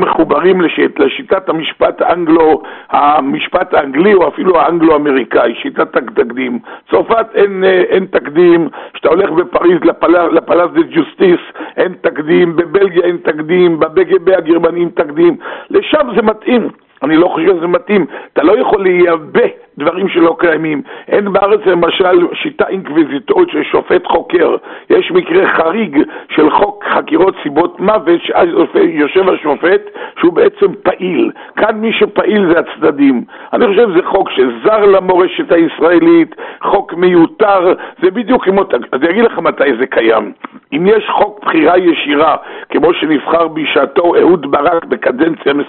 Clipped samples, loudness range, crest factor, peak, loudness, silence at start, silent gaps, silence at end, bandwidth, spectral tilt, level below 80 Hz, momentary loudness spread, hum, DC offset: under 0.1%; 2 LU; 10 dB; 0 dBFS; -11 LUFS; 0 s; none; 0 s; 4.2 kHz; -4 dB/octave; -48 dBFS; 6 LU; none; under 0.1%